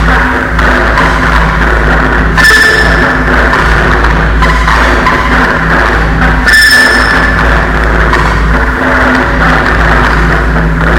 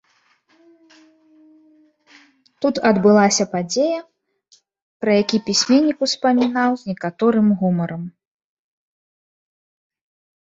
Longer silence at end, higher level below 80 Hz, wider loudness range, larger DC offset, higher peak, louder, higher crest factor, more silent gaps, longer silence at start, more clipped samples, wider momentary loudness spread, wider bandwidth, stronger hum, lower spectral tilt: second, 0 s vs 2.45 s; first, -12 dBFS vs -64 dBFS; second, 2 LU vs 5 LU; neither; about the same, 0 dBFS vs -2 dBFS; first, -6 LUFS vs -18 LUFS; second, 6 dB vs 18 dB; second, none vs 4.82-5.00 s; second, 0 s vs 2.6 s; first, 3% vs under 0.1%; second, 5 LU vs 12 LU; first, 16.5 kHz vs 8 kHz; neither; about the same, -5 dB/octave vs -4.5 dB/octave